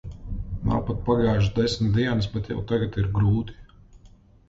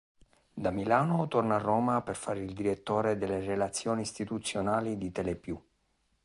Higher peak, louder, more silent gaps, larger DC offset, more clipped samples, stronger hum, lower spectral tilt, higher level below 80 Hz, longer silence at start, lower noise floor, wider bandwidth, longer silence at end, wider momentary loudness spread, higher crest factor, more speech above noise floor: about the same, -10 dBFS vs -12 dBFS; first, -24 LUFS vs -31 LUFS; neither; neither; neither; neither; first, -7.5 dB/octave vs -5.5 dB/octave; first, -38 dBFS vs -58 dBFS; second, 0.05 s vs 0.55 s; second, -52 dBFS vs -74 dBFS; second, 7.8 kHz vs 11.5 kHz; second, 0.4 s vs 0.65 s; first, 11 LU vs 8 LU; second, 14 dB vs 20 dB; second, 29 dB vs 43 dB